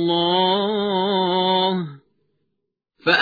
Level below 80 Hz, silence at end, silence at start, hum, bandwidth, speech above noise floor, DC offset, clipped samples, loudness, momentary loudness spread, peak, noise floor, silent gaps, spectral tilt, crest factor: -64 dBFS; 0 s; 0 s; none; 5 kHz; 58 dB; under 0.1%; under 0.1%; -20 LUFS; 8 LU; -4 dBFS; -77 dBFS; none; -6.5 dB/octave; 18 dB